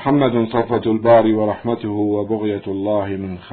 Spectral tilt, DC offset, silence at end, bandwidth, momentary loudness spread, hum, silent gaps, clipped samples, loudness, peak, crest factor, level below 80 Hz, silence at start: -12 dB/octave; under 0.1%; 0 s; 4.5 kHz; 9 LU; none; none; under 0.1%; -18 LUFS; -2 dBFS; 16 dB; -54 dBFS; 0 s